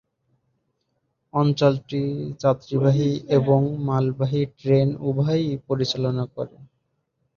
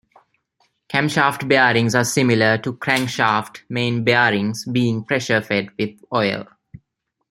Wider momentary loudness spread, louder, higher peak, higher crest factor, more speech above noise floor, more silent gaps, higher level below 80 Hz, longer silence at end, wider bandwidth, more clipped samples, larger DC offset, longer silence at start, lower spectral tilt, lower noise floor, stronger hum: about the same, 8 LU vs 8 LU; second, -22 LUFS vs -19 LUFS; about the same, -4 dBFS vs -2 dBFS; about the same, 20 dB vs 18 dB; second, 52 dB vs 56 dB; neither; about the same, -58 dBFS vs -58 dBFS; about the same, 0.75 s vs 0.85 s; second, 7 kHz vs 16.5 kHz; neither; neither; first, 1.35 s vs 0.9 s; first, -8 dB/octave vs -4.5 dB/octave; about the same, -73 dBFS vs -75 dBFS; neither